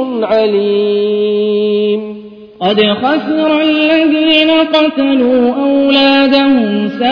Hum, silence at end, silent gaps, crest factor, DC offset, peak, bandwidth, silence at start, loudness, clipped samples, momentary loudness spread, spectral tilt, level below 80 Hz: none; 0 s; none; 10 dB; under 0.1%; 0 dBFS; 5.4 kHz; 0 s; -11 LUFS; under 0.1%; 6 LU; -7 dB/octave; -52 dBFS